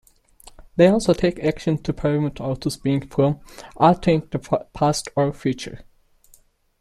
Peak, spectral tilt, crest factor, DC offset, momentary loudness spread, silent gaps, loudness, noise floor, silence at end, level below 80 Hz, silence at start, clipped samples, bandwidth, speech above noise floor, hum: -2 dBFS; -6.5 dB/octave; 20 dB; under 0.1%; 10 LU; none; -21 LUFS; -56 dBFS; 1 s; -44 dBFS; 0.6 s; under 0.1%; 13.5 kHz; 35 dB; none